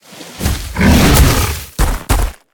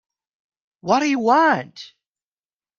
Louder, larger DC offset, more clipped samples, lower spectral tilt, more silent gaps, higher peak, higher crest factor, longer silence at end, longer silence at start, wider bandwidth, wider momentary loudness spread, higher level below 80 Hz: first, -13 LUFS vs -18 LUFS; neither; neither; about the same, -4.5 dB/octave vs -4.5 dB/octave; neither; first, 0 dBFS vs -4 dBFS; second, 12 dB vs 18 dB; second, 0.2 s vs 0.9 s; second, 0.1 s vs 0.85 s; first, 19 kHz vs 7.4 kHz; second, 11 LU vs 21 LU; first, -18 dBFS vs -70 dBFS